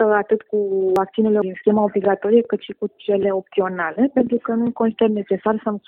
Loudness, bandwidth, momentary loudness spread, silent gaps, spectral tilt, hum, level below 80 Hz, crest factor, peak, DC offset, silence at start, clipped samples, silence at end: -20 LUFS; 4.6 kHz; 5 LU; none; -8.5 dB/octave; none; -60 dBFS; 16 dB; -4 dBFS; under 0.1%; 0 s; under 0.1%; 0.1 s